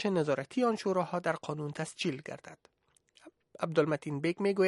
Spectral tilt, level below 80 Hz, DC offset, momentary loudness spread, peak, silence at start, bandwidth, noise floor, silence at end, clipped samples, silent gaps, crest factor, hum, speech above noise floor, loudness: -6 dB/octave; -76 dBFS; under 0.1%; 11 LU; -14 dBFS; 0 s; 11.5 kHz; -68 dBFS; 0 s; under 0.1%; none; 20 dB; none; 36 dB; -33 LUFS